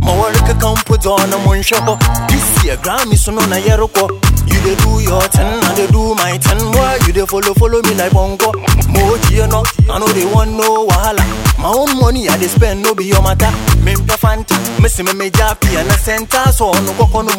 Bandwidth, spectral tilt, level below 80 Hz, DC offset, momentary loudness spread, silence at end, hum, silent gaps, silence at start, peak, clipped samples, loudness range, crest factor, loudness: 18.5 kHz; -4.5 dB/octave; -16 dBFS; under 0.1%; 2 LU; 0 s; none; none; 0 s; 0 dBFS; under 0.1%; 1 LU; 10 dB; -12 LUFS